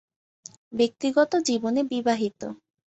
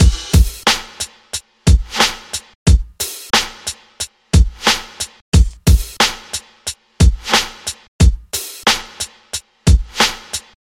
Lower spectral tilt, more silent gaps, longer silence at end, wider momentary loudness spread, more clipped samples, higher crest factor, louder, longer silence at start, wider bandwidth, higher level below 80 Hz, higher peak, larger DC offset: about the same, -4 dB/octave vs -3.5 dB/octave; second, none vs 2.55-2.66 s, 5.21-5.32 s, 7.88-7.99 s; about the same, 0.3 s vs 0.25 s; about the same, 13 LU vs 13 LU; neither; about the same, 18 dB vs 16 dB; second, -25 LUFS vs -17 LUFS; first, 0.7 s vs 0 s; second, 8.2 kHz vs 17 kHz; second, -68 dBFS vs -18 dBFS; second, -8 dBFS vs 0 dBFS; neither